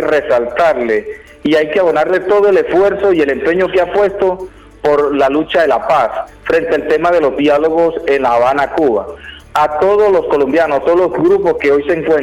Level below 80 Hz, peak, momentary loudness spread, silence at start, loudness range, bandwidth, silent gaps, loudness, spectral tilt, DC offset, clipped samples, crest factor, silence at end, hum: -42 dBFS; -4 dBFS; 6 LU; 0 s; 1 LU; 12 kHz; none; -12 LUFS; -6 dB/octave; under 0.1%; under 0.1%; 8 dB; 0 s; none